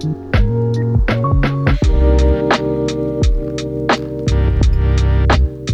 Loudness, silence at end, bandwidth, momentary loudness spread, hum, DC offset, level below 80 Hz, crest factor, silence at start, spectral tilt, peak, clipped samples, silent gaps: -16 LUFS; 0 s; 8.4 kHz; 5 LU; none; under 0.1%; -16 dBFS; 14 dB; 0 s; -7 dB/octave; 0 dBFS; under 0.1%; none